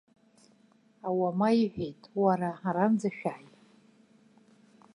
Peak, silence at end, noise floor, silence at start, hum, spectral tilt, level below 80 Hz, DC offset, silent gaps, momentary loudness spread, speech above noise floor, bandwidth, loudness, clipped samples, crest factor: -12 dBFS; 1.55 s; -64 dBFS; 1.05 s; none; -7.5 dB/octave; -70 dBFS; under 0.1%; none; 12 LU; 35 dB; 10.5 kHz; -29 LUFS; under 0.1%; 18 dB